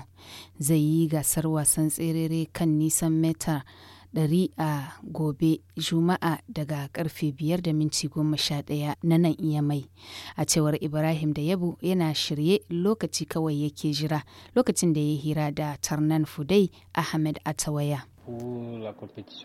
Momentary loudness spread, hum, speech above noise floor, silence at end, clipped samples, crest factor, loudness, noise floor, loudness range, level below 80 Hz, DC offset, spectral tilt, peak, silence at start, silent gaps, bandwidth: 11 LU; none; 21 dB; 0 s; under 0.1%; 18 dB; -26 LUFS; -47 dBFS; 3 LU; -56 dBFS; under 0.1%; -5 dB/octave; -10 dBFS; 0 s; none; 16.5 kHz